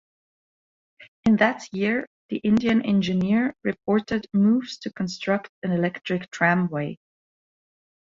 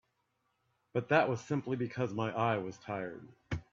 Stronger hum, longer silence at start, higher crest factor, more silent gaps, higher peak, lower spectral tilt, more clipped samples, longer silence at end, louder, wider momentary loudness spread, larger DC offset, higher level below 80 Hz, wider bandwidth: neither; about the same, 1 s vs 0.95 s; about the same, 20 dB vs 24 dB; first, 1.08-1.23 s, 2.07-2.29 s, 5.49-5.62 s vs none; first, -6 dBFS vs -12 dBFS; about the same, -6.5 dB/octave vs -7 dB/octave; neither; first, 1.15 s vs 0.1 s; first, -24 LUFS vs -35 LUFS; second, 9 LU vs 13 LU; neither; about the same, -60 dBFS vs -64 dBFS; about the same, 7.6 kHz vs 7.6 kHz